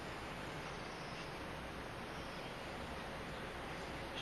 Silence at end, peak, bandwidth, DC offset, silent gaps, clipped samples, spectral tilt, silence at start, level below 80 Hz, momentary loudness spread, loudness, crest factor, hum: 0 s; -32 dBFS; 13 kHz; under 0.1%; none; under 0.1%; -4.5 dB/octave; 0 s; -58 dBFS; 1 LU; -46 LUFS; 14 dB; none